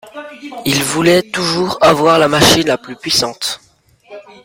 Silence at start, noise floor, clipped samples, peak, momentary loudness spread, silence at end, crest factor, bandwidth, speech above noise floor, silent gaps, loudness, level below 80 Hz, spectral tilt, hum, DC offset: 0.05 s; -48 dBFS; under 0.1%; 0 dBFS; 16 LU; 0.25 s; 14 dB; 16.5 kHz; 34 dB; none; -13 LUFS; -44 dBFS; -3.5 dB/octave; none; under 0.1%